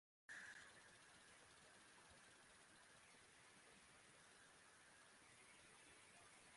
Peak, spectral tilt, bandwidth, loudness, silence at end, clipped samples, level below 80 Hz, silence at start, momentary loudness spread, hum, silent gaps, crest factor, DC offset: -48 dBFS; -1.5 dB/octave; 11.5 kHz; -65 LUFS; 0 s; under 0.1%; -90 dBFS; 0.3 s; 7 LU; none; none; 18 dB; under 0.1%